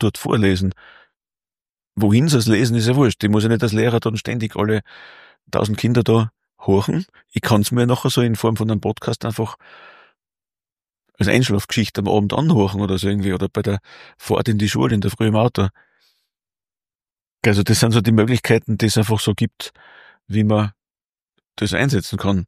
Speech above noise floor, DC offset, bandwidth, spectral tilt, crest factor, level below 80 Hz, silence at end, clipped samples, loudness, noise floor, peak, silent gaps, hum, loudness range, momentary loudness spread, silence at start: over 72 dB; under 0.1%; 15.5 kHz; -6 dB/octave; 18 dB; -48 dBFS; 0 s; under 0.1%; -18 LUFS; under -90 dBFS; -2 dBFS; 17.27-17.37 s, 21.06-21.13 s; none; 4 LU; 9 LU; 0 s